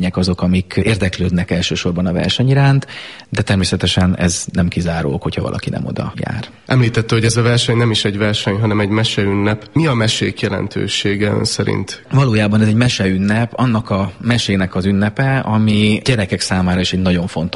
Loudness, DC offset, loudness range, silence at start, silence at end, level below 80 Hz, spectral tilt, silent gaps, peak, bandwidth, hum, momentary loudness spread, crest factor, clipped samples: -16 LUFS; 0.2%; 2 LU; 0 s; 0 s; -38 dBFS; -5.5 dB/octave; none; 0 dBFS; 11.5 kHz; none; 7 LU; 14 dB; under 0.1%